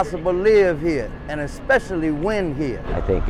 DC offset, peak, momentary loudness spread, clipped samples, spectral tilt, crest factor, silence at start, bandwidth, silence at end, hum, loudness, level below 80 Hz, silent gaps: under 0.1%; -8 dBFS; 12 LU; under 0.1%; -7 dB/octave; 12 dB; 0 s; 11.5 kHz; 0 s; none; -21 LUFS; -32 dBFS; none